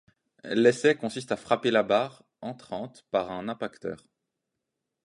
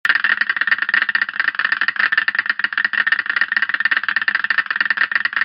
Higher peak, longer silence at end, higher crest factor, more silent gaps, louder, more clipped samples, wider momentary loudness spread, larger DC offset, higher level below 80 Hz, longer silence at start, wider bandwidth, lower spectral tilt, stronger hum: second, -8 dBFS vs 0 dBFS; first, 1.1 s vs 0 s; about the same, 22 dB vs 18 dB; neither; second, -27 LUFS vs -17 LUFS; neither; first, 17 LU vs 3 LU; neither; about the same, -70 dBFS vs -74 dBFS; first, 0.45 s vs 0.05 s; first, 11.5 kHz vs 6.8 kHz; first, -5 dB/octave vs -2 dB/octave; neither